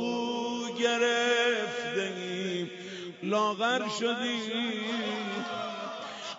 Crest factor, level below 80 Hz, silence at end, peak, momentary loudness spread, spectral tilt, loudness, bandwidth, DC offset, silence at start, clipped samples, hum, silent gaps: 16 dB; -84 dBFS; 0 s; -14 dBFS; 12 LU; -3.5 dB/octave; -30 LUFS; 8 kHz; under 0.1%; 0 s; under 0.1%; none; none